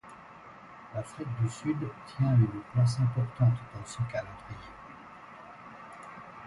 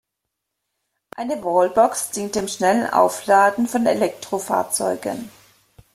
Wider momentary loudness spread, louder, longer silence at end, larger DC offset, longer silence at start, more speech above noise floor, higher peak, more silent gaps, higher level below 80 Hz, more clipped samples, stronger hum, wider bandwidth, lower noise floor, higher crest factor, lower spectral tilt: first, 22 LU vs 13 LU; second, -30 LUFS vs -20 LUFS; second, 0 s vs 0.65 s; neither; second, 0.05 s vs 1.2 s; second, 21 dB vs 61 dB; second, -14 dBFS vs -2 dBFS; neither; about the same, -58 dBFS vs -60 dBFS; neither; neither; second, 11.5 kHz vs 16 kHz; second, -50 dBFS vs -80 dBFS; about the same, 18 dB vs 18 dB; first, -7.5 dB/octave vs -3.5 dB/octave